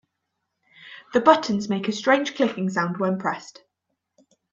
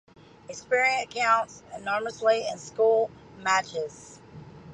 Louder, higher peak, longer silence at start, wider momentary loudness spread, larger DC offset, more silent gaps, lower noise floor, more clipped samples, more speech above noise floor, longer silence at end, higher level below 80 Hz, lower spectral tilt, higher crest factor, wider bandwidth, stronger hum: first, -22 LUFS vs -26 LUFS; first, -2 dBFS vs -10 dBFS; first, 0.8 s vs 0.5 s; second, 13 LU vs 23 LU; neither; neither; first, -79 dBFS vs -46 dBFS; neither; first, 57 dB vs 20 dB; first, 1 s vs 0 s; about the same, -68 dBFS vs -64 dBFS; first, -5.5 dB/octave vs -2.5 dB/octave; first, 24 dB vs 16 dB; second, 7.6 kHz vs 10.5 kHz; neither